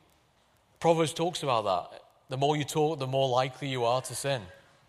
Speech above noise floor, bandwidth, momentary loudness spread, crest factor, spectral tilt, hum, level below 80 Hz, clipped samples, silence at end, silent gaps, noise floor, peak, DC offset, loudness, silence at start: 38 dB; 15 kHz; 6 LU; 18 dB; -5 dB/octave; none; -68 dBFS; under 0.1%; 0.35 s; none; -66 dBFS; -12 dBFS; under 0.1%; -29 LUFS; 0.8 s